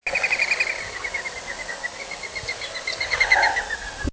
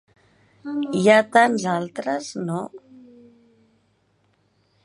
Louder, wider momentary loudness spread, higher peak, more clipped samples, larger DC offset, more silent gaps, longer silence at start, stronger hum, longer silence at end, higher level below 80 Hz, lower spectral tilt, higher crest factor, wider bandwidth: about the same, -23 LUFS vs -21 LUFS; second, 13 LU vs 16 LU; about the same, -4 dBFS vs -2 dBFS; neither; neither; neither; second, 0.05 s vs 0.65 s; neither; second, 0 s vs 2.05 s; first, -44 dBFS vs -72 dBFS; second, -1.5 dB/octave vs -5 dB/octave; about the same, 22 dB vs 22 dB; second, 8 kHz vs 11.5 kHz